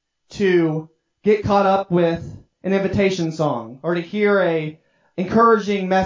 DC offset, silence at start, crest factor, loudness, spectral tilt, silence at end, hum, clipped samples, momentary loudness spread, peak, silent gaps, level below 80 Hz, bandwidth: under 0.1%; 0.3 s; 16 dB; -19 LUFS; -7 dB/octave; 0 s; none; under 0.1%; 13 LU; -4 dBFS; none; -48 dBFS; 7.6 kHz